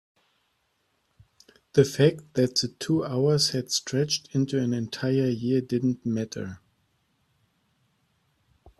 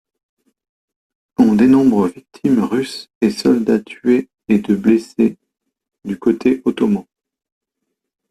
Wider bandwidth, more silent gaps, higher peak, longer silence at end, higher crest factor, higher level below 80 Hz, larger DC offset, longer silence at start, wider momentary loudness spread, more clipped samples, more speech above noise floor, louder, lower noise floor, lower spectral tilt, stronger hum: first, 14 kHz vs 12.5 kHz; second, none vs 3.15-3.21 s; second, -6 dBFS vs -2 dBFS; first, 2.25 s vs 1.3 s; first, 22 dB vs 16 dB; second, -64 dBFS vs -54 dBFS; neither; first, 1.75 s vs 1.4 s; second, 7 LU vs 10 LU; neither; second, 48 dB vs 61 dB; second, -25 LUFS vs -16 LUFS; second, -73 dBFS vs -77 dBFS; second, -5 dB/octave vs -7 dB/octave; neither